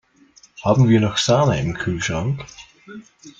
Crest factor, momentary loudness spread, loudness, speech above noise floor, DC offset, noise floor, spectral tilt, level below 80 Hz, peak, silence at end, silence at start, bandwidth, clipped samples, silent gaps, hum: 18 dB; 20 LU; -19 LUFS; 34 dB; under 0.1%; -52 dBFS; -5.5 dB/octave; -46 dBFS; -2 dBFS; 0.1 s; 0.6 s; 9 kHz; under 0.1%; none; none